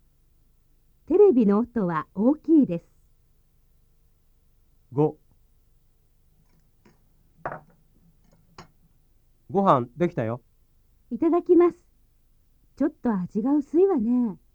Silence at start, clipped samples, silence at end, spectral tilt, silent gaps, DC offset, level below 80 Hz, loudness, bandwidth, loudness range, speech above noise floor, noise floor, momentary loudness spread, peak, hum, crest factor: 1.1 s; under 0.1%; 0.2 s; -10 dB/octave; none; under 0.1%; -58 dBFS; -23 LUFS; 6.8 kHz; 23 LU; 39 dB; -61 dBFS; 16 LU; -4 dBFS; none; 22 dB